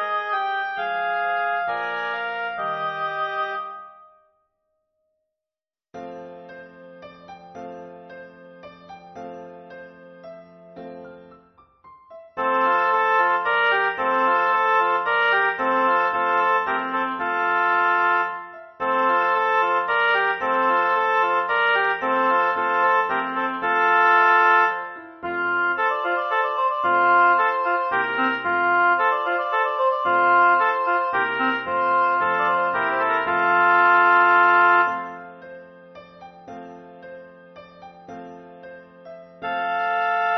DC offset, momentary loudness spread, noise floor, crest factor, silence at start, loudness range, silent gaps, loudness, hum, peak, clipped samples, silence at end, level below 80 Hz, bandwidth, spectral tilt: under 0.1%; 23 LU; under -90 dBFS; 16 dB; 0 s; 22 LU; none; -20 LUFS; none; -6 dBFS; under 0.1%; 0 s; -68 dBFS; 6.2 kHz; -4.5 dB/octave